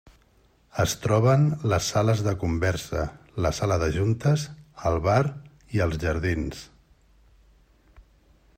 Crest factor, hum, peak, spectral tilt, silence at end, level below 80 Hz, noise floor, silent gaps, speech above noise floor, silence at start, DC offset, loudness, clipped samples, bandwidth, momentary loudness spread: 18 dB; none; -8 dBFS; -6 dB/octave; 1.95 s; -44 dBFS; -61 dBFS; none; 37 dB; 0.75 s; under 0.1%; -25 LUFS; under 0.1%; 16 kHz; 9 LU